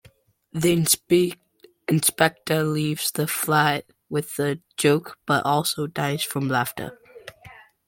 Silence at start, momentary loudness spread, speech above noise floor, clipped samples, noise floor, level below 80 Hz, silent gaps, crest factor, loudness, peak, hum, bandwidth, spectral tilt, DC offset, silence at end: 0.55 s; 16 LU; 34 dB; under 0.1%; -56 dBFS; -60 dBFS; none; 22 dB; -23 LUFS; -2 dBFS; none; 17 kHz; -4 dB/octave; under 0.1%; 0.35 s